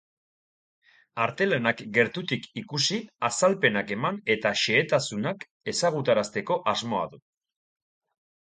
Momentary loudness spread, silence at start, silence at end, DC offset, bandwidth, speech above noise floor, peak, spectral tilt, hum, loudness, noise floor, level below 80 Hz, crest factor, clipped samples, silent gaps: 9 LU; 1.15 s; 1.4 s; under 0.1%; 9.6 kHz; over 64 dB; -8 dBFS; -3.5 dB/octave; none; -26 LUFS; under -90 dBFS; -68 dBFS; 20 dB; under 0.1%; 5.51-5.60 s